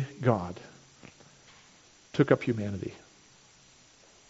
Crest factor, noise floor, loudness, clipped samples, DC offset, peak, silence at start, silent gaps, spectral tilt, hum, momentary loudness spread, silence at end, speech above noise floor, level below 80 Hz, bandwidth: 26 dB; -59 dBFS; -30 LUFS; under 0.1%; under 0.1%; -8 dBFS; 0 s; none; -7 dB/octave; none; 27 LU; 1.35 s; 31 dB; -64 dBFS; 8 kHz